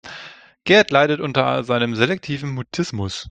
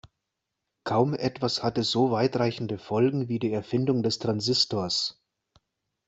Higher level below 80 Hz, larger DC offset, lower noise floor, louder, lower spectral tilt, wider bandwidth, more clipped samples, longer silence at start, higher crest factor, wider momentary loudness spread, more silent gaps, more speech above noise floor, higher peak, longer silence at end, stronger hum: first, -56 dBFS vs -62 dBFS; neither; second, -41 dBFS vs -83 dBFS; first, -19 LUFS vs -26 LUFS; about the same, -5 dB/octave vs -5.5 dB/octave; first, 9.2 kHz vs 8.2 kHz; neither; second, 0.05 s vs 0.85 s; about the same, 20 dB vs 18 dB; first, 14 LU vs 5 LU; neither; second, 22 dB vs 58 dB; first, 0 dBFS vs -8 dBFS; second, 0 s vs 0.95 s; neither